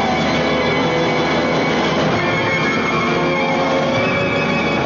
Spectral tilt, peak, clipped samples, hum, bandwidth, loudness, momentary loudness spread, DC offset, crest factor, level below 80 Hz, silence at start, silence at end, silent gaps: -5.5 dB/octave; -8 dBFS; under 0.1%; none; 7.2 kHz; -16 LUFS; 0 LU; under 0.1%; 10 dB; -42 dBFS; 0 s; 0 s; none